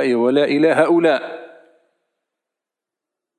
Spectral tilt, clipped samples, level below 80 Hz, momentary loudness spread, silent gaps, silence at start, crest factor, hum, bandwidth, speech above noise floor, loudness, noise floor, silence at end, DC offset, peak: -6 dB/octave; under 0.1%; -82 dBFS; 15 LU; none; 0 s; 16 dB; none; 11.5 kHz; 70 dB; -16 LUFS; -86 dBFS; 1.9 s; under 0.1%; -2 dBFS